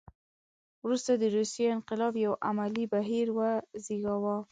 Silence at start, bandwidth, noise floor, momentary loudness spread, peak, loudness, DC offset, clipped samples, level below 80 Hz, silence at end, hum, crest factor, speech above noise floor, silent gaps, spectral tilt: 0.85 s; 9.4 kHz; under -90 dBFS; 6 LU; -16 dBFS; -31 LUFS; under 0.1%; under 0.1%; -70 dBFS; 0.1 s; none; 14 dB; over 60 dB; none; -5.5 dB/octave